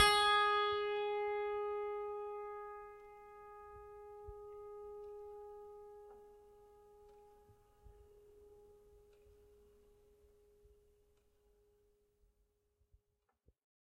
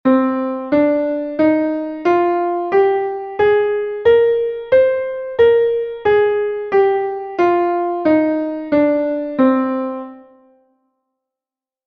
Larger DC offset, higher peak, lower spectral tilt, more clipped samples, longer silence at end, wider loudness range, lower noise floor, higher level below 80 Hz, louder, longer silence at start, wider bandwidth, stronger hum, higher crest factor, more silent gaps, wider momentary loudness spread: neither; second, -14 dBFS vs -2 dBFS; second, -1 dB/octave vs -7.5 dB/octave; neither; first, 5.15 s vs 1.65 s; first, 26 LU vs 3 LU; second, -83 dBFS vs -90 dBFS; second, -68 dBFS vs -54 dBFS; second, -37 LUFS vs -16 LUFS; about the same, 0 s vs 0.05 s; first, 14 kHz vs 6.2 kHz; neither; first, 28 dB vs 14 dB; neither; first, 25 LU vs 7 LU